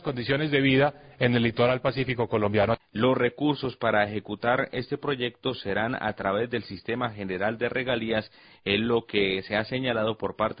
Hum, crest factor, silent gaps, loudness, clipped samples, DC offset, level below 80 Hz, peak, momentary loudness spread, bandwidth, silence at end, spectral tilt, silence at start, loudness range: none; 18 dB; none; -26 LUFS; under 0.1%; under 0.1%; -54 dBFS; -8 dBFS; 7 LU; 5.2 kHz; 0 s; -10.5 dB/octave; 0 s; 4 LU